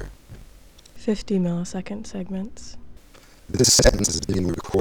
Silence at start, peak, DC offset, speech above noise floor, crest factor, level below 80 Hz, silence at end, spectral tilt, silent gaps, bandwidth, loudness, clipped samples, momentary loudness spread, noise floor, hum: 0 s; -2 dBFS; under 0.1%; 27 dB; 22 dB; -34 dBFS; 0 s; -3.5 dB/octave; none; over 20 kHz; -22 LUFS; under 0.1%; 20 LU; -49 dBFS; none